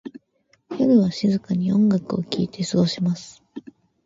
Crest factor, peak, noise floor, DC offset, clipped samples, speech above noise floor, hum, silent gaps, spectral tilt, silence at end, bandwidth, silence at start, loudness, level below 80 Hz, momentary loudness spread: 16 dB; -6 dBFS; -64 dBFS; under 0.1%; under 0.1%; 44 dB; none; none; -7 dB/octave; 0.45 s; 7.8 kHz; 0.05 s; -21 LUFS; -60 dBFS; 22 LU